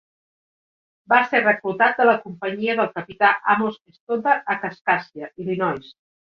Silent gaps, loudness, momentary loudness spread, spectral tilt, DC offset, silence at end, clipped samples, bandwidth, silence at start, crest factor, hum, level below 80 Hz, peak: 3.81-3.85 s, 4.00-4.07 s, 4.81-4.85 s; -20 LUFS; 11 LU; -7 dB/octave; under 0.1%; 0.4 s; under 0.1%; 6.4 kHz; 1.1 s; 18 dB; none; -68 dBFS; -4 dBFS